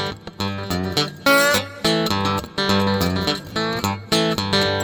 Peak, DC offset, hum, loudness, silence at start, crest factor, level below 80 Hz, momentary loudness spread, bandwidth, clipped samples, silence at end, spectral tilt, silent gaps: -4 dBFS; under 0.1%; none; -20 LUFS; 0 s; 16 dB; -46 dBFS; 9 LU; over 20 kHz; under 0.1%; 0 s; -4 dB/octave; none